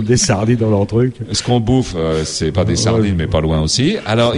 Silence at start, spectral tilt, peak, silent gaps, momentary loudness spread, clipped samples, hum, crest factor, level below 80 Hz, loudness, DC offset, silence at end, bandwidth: 0 s; -5 dB/octave; -2 dBFS; none; 4 LU; under 0.1%; none; 14 dB; -32 dBFS; -15 LUFS; under 0.1%; 0 s; 11.5 kHz